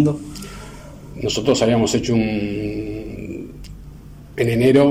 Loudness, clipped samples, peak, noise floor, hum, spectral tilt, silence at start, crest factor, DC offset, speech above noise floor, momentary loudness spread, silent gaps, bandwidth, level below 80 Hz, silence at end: -20 LUFS; under 0.1%; -2 dBFS; -38 dBFS; none; -5.5 dB/octave; 0 s; 16 dB; 0.1%; 21 dB; 22 LU; none; 16 kHz; -40 dBFS; 0 s